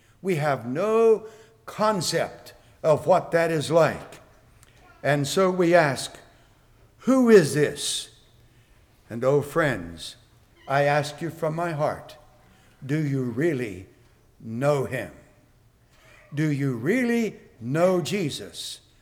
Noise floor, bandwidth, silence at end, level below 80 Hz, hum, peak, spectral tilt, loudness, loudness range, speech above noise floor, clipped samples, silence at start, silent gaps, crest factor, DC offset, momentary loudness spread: -58 dBFS; 18.5 kHz; 0.25 s; -60 dBFS; none; -6 dBFS; -5.5 dB/octave; -24 LUFS; 7 LU; 35 dB; under 0.1%; 0.25 s; none; 20 dB; under 0.1%; 17 LU